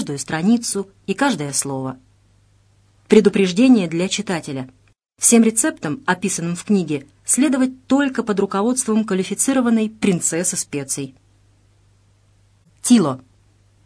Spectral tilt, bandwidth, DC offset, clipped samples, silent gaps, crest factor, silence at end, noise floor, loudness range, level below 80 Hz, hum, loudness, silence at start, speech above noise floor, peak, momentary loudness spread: -4 dB/octave; 11 kHz; under 0.1%; under 0.1%; none; 20 dB; 0.65 s; -56 dBFS; 5 LU; -58 dBFS; none; -18 LUFS; 0 s; 38 dB; 0 dBFS; 12 LU